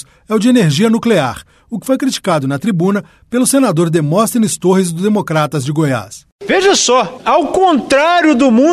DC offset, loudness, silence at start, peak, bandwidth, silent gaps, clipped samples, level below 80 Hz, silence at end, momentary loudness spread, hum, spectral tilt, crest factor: under 0.1%; -13 LUFS; 0.3 s; -2 dBFS; 13.5 kHz; 6.32-6.39 s; under 0.1%; -50 dBFS; 0 s; 10 LU; none; -5 dB/octave; 12 dB